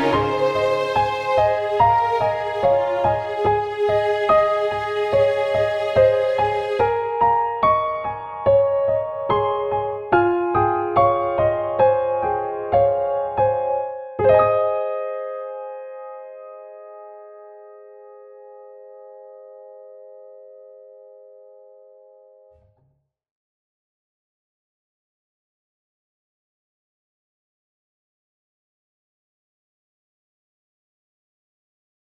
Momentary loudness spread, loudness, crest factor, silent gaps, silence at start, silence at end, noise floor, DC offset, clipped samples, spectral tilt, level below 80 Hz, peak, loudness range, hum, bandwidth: 15 LU; -20 LUFS; 20 dB; none; 0 s; 11.2 s; -66 dBFS; under 0.1%; under 0.1%; -6.5 dB/octave; -50 dBFS; -4 dBFS; 13 LU; none; 8.4 kHz